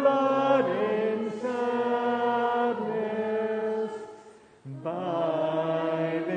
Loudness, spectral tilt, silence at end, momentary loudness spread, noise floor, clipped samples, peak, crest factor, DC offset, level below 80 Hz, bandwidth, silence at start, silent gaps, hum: -27 LUFS; -7 dB/octave; 0 s; 10 LU; -52 dBFS; under 0.1%; -10 dBFS; 16 dB; under 0.1%; -76 dBFS; 9.4 kHz; 0 s; none; none